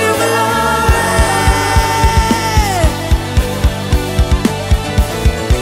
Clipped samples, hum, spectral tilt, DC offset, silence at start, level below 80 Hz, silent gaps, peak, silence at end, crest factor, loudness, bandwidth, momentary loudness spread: under 0.1%; none; -4.5 dB/octave; under 0.1%; 0 s; -16 dBFS; none; 0 dBFS; 0 s; 12 dB; -13 LUFS; 16.5 kHz; 4 LU